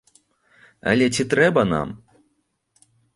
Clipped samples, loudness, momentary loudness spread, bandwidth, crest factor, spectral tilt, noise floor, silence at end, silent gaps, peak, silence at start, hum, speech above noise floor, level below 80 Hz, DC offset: under 0.1%; -20 LUFS; 14 LU; 11.5 kHz; 20 dB; -5 dB/octave; -70 dBFS; 1.2 s; none; -2 dBFS; 0.85 s; none; 51 dB; -52 dBFS; under 0.1%